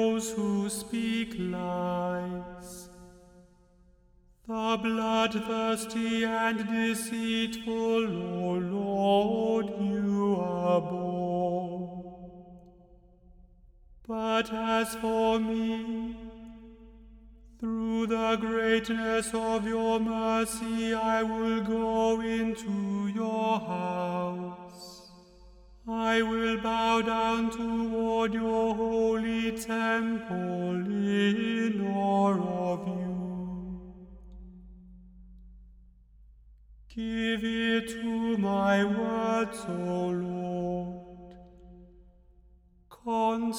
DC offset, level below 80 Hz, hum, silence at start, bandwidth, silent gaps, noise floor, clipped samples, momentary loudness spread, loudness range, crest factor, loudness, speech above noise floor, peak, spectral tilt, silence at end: under 0.1%; -56 dBFS; none; 0 s; 15 kHz; none; -61 dBFS; under 0.1%; 14 LU; 7 LU; 16 dB; -29 LUFS; 32 dB; -14 dBFS; -5.5 dB/octave; 0 s